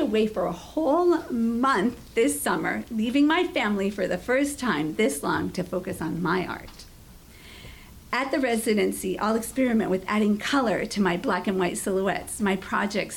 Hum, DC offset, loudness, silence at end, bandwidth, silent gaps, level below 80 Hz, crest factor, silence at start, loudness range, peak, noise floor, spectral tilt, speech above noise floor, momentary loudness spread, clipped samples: none; under 0.1%; -25 LUFS; 0 s; 18 kHz; none; -52 dBFS; 12 dB; 0 s; 5 LU; -12 dBFS; -48 dBFS; -4.5 dB/octave; 23 dB; 7 LU; under 0.1%